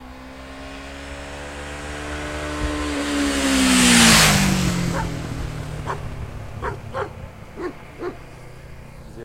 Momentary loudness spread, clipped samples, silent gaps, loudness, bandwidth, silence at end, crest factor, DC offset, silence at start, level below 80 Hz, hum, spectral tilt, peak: 26 LU; under 0.1%; none; -19 LUFS; 16 kHz; 0 s; 20 dB; under 0.1%; 0 s; -34 dBFS; none; -3 dB/octave; -2 dBFS